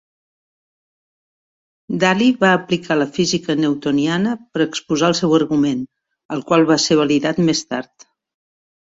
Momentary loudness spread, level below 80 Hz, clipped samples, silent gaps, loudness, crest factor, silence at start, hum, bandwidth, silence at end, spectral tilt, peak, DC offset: 12 LU; -58 dBFS; under 0.1%; 6.25-6.29 s; -17 LUFS; 18 dB; 1.9 s; none; 8 kHz; 1.15 s; -4.5 dB/octave; -2 dBFS; under 0.1%